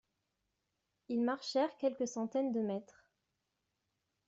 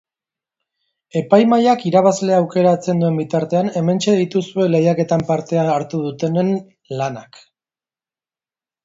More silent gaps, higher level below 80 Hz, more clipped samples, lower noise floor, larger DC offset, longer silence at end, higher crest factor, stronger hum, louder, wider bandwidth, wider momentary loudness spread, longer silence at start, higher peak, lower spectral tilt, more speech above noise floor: neither; second, -84 dBFS vs -60 dBFS; neither; second, -86 dBFS vs under -90 dBFS; neither; second, 1.45 s vs 1.6 s; about the same, 18 dB vs 18 dB; neither; second, -37 LUFS vs -17 LUFS; about the same, 8 kHz vs 7.8 kHz; second, 5 LU vs 10 LU; about the same, 1.1 s vs 1.15 s; second, -22 dBFS vs 0 dBFS; second, -4.5 dB/octave vs -7 dB/octave; second, 50 dB vs over 74 dB